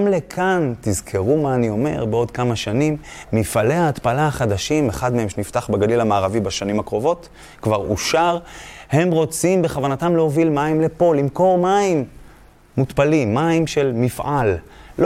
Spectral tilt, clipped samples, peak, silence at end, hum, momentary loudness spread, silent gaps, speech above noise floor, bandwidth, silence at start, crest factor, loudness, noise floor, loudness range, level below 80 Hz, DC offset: -6 dB/octave; under 0.1%; -2 dBFS; 0 s; none; 6 LU; none; 28 dB; 16 kHz; 0 s; 16 dB; -19 LUFS; -46 dBFS; 3 LU; -44 dBFS; under 0.1%